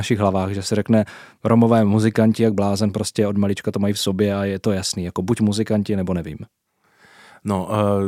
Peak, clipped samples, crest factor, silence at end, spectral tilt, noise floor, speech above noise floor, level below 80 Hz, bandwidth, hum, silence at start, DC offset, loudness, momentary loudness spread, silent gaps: -2 dBFS; under 0.1%; 18 dB; 0 s; -6 dB/octave; -55 dBFS; 36 dB; -54 dBFS; 15 kHz; none; 0 s; under 0.1%; -20 LUFS; 9 LU; none